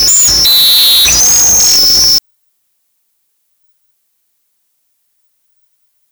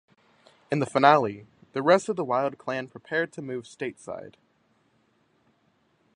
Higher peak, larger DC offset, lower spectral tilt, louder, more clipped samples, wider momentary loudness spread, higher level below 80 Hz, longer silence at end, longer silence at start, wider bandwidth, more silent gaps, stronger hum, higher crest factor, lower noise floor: second, -6 dBFS vs -2 dBFS; neither; second, 1.5 dB/octave vs -5.5 dB/octave; first, -4 LUFS vs -26 LUFS; neither; second, 2 LU vs 18 LU; first, -36 dBFS vs -72 dBFS; first, 3.9 s vs 1.85 s; second, 0 s vs 0.7 s; first, over 20 kHz vs 11 kHz; neither; neither; second, 6 dB vs 26 dB; second, -62 dBFS vs -68 dBFS